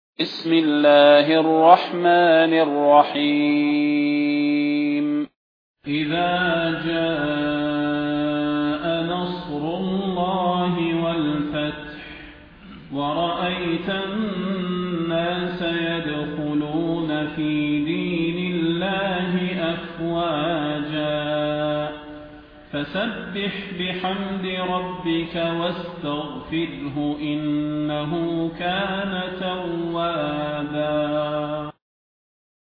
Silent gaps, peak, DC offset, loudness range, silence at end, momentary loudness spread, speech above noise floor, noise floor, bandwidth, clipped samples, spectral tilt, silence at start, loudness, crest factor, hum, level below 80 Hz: 5.36-5.74 s; 0 dBFS; under 0.1%; 9 LU; 0.9 s; 11 LU; 22 dB; -43 dBFS; 5.2 kHz; under 0.1%; -8.5 dB/octave; 0.2 s; -22 LUFS; 20 dB; none; -52 dBFS